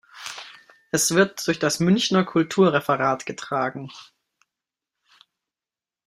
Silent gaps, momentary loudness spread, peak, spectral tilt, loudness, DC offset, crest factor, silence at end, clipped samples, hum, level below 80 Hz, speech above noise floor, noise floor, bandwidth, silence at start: none; 17 LU; -4 dBFS; -4 dB/octave; -21 LUFS; under 0.1%; 20 dB; 2.05 s; under 0.1%; none; -64 dBFS; over 68 dB; under -90 dBFS; 16 kHz; 0.15 s